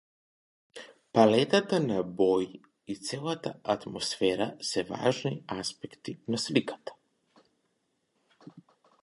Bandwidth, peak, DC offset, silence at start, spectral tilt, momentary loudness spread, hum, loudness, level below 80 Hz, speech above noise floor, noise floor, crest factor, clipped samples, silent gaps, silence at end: 11.5 kHz; -8 dBFS; under 0.1%; 0.75 s; -5 dB/octave; 19 LU; none; -29 LUFS; -68 dBFS; 48 dB; -77 dBFS; 24 dB; under 0.1%; none; 0.4 s